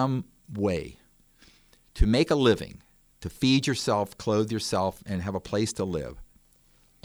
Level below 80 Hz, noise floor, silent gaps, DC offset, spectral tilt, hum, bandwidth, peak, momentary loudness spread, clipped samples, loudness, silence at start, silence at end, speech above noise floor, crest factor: -40 dBFS; -61 dBFS; none; under 0.1%; -5.5 dB/octave; none; over 20 kHz; -8 dBFS; 18 LU; under 0.1%; -27 LUFS; 0 s; 0.8 s; 35 dB; 20 dB